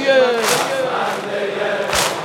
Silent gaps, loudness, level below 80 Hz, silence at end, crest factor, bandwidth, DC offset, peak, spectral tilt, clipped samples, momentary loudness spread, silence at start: none; -18 LUFS; -48 dBFS; 0 s; 14 dB; 18 kHz; under 0.1%; -2 dBFS; -2 dB/octave; under 0.1%; 7 LU; 0 s